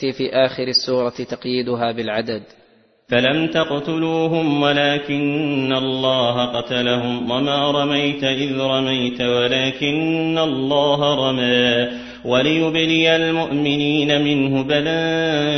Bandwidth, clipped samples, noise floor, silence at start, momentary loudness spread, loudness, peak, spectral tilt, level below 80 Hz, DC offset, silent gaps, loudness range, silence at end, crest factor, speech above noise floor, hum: 6.4 kHz; under 0.1%; -54 dBFS; 0 s; 5 LU; -18 LUFS; -2 dBFS; -5.5 dB/octave; -54 dBFS; under 0.1%; none; 3 LU; 0 s; 18 dB; 36 dB; none